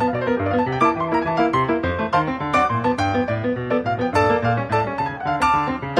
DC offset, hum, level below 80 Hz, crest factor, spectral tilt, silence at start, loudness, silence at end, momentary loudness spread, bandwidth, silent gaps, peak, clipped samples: under 0.1%; none; -44 dBFS; 16 dB; -6.5 dB/octave; 0 s; -20 LUFS; 0 s; 4 LU; 12 kHz; none; -4 dBFS; under 0.1%